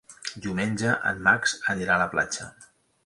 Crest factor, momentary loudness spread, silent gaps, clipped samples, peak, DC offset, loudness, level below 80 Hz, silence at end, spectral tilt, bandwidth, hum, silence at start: 22 dB; 13 LU; none; under 0.1%; -6 dBFS; under 0.1%; -25 LUFS; -56 dBFS; 0.4 s; -3.5 dB/octave; 11.5 kHz; none; 0.1 s